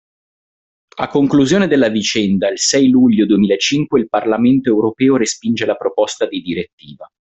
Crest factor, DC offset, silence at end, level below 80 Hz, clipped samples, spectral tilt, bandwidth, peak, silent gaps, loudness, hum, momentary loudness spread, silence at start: 12 dB; under 0.1%; 0.15 s; -52 dBFS; under 0.1%; -4.5 dB/octave; 8.4 kHz; -2 dBFS; 6.73-6.78 s; -14 LUFS; none; 9 LU; 0.95 s